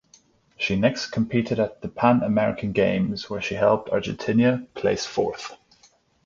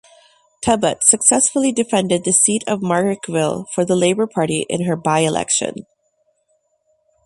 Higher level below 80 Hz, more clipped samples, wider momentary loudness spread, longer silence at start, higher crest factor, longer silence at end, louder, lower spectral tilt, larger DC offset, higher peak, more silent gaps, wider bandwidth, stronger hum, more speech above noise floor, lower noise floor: about the same, -52 dBFS vs -54 dBFS; neither; about the same, 8 LU vs 8 LU; about the same, 0.6 s vs 0.6 s; about the same, 20 dB vs 18 dB; second, 0.7 s vs 1.45 s; second, -23 LUFS vs -16 LUFS; first, -6 dB/octave vs -3.5 dB/octave; neither; second, -4 dBFS vs 0 dBFS; neither; second, 7.4 kHz vs 12.5 kHz; neither; second, 37 dB vs 48 dB; second, -59 dBFS vs -65 dBFS